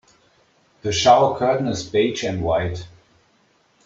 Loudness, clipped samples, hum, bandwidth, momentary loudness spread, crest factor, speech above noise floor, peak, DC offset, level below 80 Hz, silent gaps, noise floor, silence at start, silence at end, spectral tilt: -19 LUFS; under 0.1%; none; 7.8 kHz; 13 LU; 20 dB; 42 dB; -2 dBFS; under 0.1%; -50 dBFS; none; -61 dBFS; 0.85 s; 1 s; -4.5 dB/octave